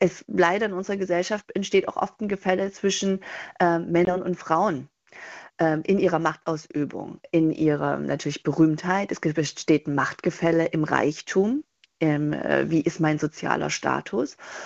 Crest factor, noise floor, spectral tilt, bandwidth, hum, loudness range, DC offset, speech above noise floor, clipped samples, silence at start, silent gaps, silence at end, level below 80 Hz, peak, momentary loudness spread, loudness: 20 dB; -44 dBFS; -5.5 dB/octave; 8 kHz; none; 2 LU; under 0.1%; 20 dB; under 0.1%; 0 s; none; 0 s; -60 dBFS; -4 dBFS; 8 LU; -24 LUFS